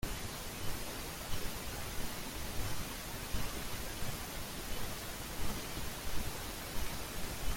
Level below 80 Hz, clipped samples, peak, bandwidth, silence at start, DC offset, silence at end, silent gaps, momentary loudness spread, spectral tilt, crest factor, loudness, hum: -46 dBFS; under 0.1%; -22 dBFS; 17 kHz; 0 s; under 0.1%; 0 s; none; 2 LU; -3 dB/octave; 16 dB; -41 LUFS; none